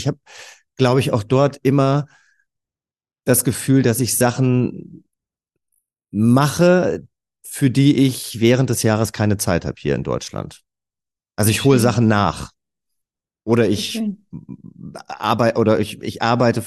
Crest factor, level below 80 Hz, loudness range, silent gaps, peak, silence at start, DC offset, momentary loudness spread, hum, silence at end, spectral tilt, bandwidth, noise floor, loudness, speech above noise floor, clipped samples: 18 dB; -50 dBFS; 4 LU; none; -2 dBFS; 0 s; under 0.1%; 19 LU; none; 0 s; -5.5 dB/octave; 13 kHz; under -90 dBFS; -18 LUFS; over 73 dB; under 0.1%